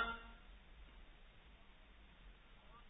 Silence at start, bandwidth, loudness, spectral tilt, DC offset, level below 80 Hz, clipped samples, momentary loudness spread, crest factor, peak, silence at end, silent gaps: 0 s; 3.9 kHz; -57 LUFS; -0.5 dB/octave; under 0.1%; -62 dBFS; under 0.1%; 11 LU; 24 dB; -28 dBFS; 0 s; none